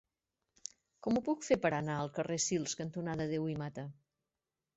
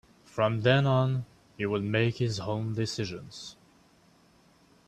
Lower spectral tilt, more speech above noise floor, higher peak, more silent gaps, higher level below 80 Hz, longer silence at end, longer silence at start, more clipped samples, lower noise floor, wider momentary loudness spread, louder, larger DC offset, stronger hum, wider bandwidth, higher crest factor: about the same, -5.5 dB/octave vs -6 dB/octave; first, over 55 dB vs 34 dB; second, -18 dBFS vs -10 dBFS; neither; second, -68 dBFS vs -62 dBFS; second, 0.85 s vs 1.35 s; first, 1 s vs 0.35 s; neither; first, under -90 dBFS vs -62 dBFS; about the same, 17 LU vs 18 LU; second, -36 LUFS vs -28 LUFS; neither; neither; second, 8 kHz vs 9.6 kHz; about the same, 20 dB vs 20 dB